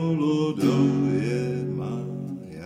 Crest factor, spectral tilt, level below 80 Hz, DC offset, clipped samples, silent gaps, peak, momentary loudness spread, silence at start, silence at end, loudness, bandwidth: 16 dB; -8 dB/octave; -60 dBFS; under 0.1%; under 0.1%; none; -8 dBFS; 11 LU; 0 s; 0 s; -25 LUFS; 15 kHz